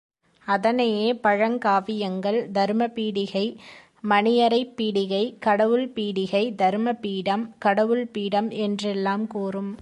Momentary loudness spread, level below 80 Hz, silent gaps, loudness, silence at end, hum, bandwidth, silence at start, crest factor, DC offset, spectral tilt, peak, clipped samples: 7 LU; -70 dBFS; none; -23 LUFS; 0 s; none; 10.5 kHz; 0.45 s; 18 dB; under 0.1%; -6 dB/octave; -6 dBFS; under 0.1%